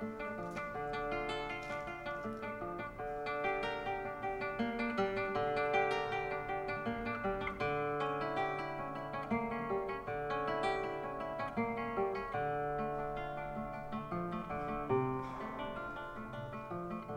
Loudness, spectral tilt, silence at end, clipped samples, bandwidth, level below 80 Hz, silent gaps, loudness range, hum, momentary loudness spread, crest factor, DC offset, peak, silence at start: -38 LUFS; -6.5 dB/octave; 0 s; under 0.1%; 16.5 kHz; -58 dBFS; none; 4 LU; none; 7 LU; 18 dB; under 0.1%; -20 dBFS; 0 s